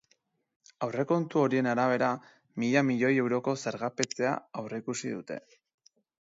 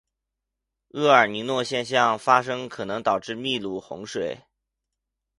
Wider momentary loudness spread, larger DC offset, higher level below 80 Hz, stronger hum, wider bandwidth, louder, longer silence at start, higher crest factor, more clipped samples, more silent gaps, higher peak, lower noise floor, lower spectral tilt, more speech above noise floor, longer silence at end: second, 12 LU vs 15 LU; neither; second, -78 dBFS vs -66 dBFS; neither; second, 7.8 kHz vs 11.5 kHz; second, -30 LUFS vs -23 LUFS; second, 0.8 s vs 0.95 s; about the same, 22 dB vs 24 dB; neither; neither; second, -8 dBFS vs -2 dBFS; second, -72 dBFS vs -84 dBFS; first, -5.5 dB/octave vs -4 dB/octave; second, 43 dB vs 60 dB; about the same, 0.9 s vs 1 s